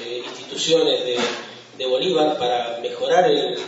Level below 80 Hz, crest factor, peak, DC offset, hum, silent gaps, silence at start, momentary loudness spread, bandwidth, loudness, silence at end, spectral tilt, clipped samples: -72 dBFS; 16 dB; -4 dBFS; under 0.1%; none; none; 0 s; 13 LU; 8 kHz; -20 LUFS; 0 s; -3 dB/octave; under 0.1%